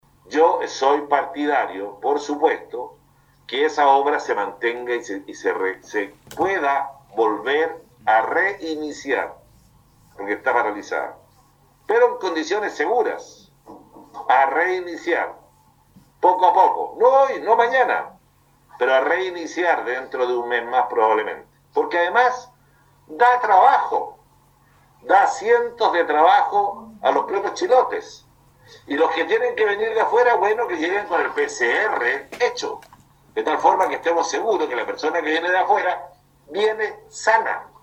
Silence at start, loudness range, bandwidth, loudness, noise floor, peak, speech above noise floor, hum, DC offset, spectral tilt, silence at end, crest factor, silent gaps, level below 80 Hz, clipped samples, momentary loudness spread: 0.3 s; 5 LU; 11 kHz; -20 LUFS; -57 dBFS; -2 dBFS; 38 dB; none; under 0.1%; -3 dB/octave; 0.15 s; 20 dB; none; -64 dBFS; under 0.1%; 12 LU